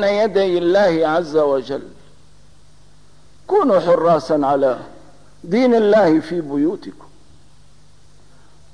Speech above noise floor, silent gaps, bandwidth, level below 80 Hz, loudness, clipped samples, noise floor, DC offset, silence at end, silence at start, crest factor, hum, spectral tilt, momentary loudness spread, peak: 35 dB; none; 10.5 kHz; -54 dBFS; -16 LUFS; under 0.1%; -51 dBFS; 0.8%; 1.85 s; 0 s; 12 dB; 50 Hz at -55 dBFS; -6.5 dB/octave; 10 LU; -6 dBFS